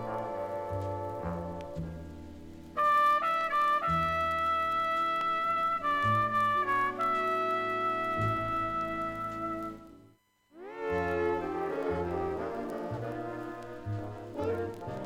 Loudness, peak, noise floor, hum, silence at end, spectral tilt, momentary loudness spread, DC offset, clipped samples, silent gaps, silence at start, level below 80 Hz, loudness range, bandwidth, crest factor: -31 LUFS; -18 dBFS; -64 dBFS; none; 0 s; -6.5 dB/octave; 13 LU; under 0.1%; under 0.1%; none; 0 s; -56 dBFS; 7 LU; 16.5 kHz; 14 dB